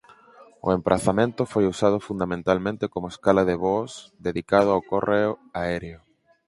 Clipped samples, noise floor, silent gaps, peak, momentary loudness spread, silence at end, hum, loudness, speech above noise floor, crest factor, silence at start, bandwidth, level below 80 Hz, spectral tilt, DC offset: under 0.1%; -52 dBFS; none; -2 dBFS; 9 LU; 0.5 s; none; -24 LUFS; 29 dB; 22 dB; 0.4 s; 11.5 kHz; -50 dBFS; -6.5 dB/octave; under 0.1%